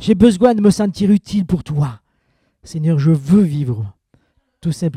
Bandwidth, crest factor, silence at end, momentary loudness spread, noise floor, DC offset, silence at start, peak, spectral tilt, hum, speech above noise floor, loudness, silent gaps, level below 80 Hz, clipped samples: 12 kHz; 16 dB; 0 s; 13 LU; -63 dBFS; under 0.1%; 0 s; 0 dBFS; -7.5 dB/octave; none; 49 dB; -16 LUFS; none; -42 dBFS; under 0.1%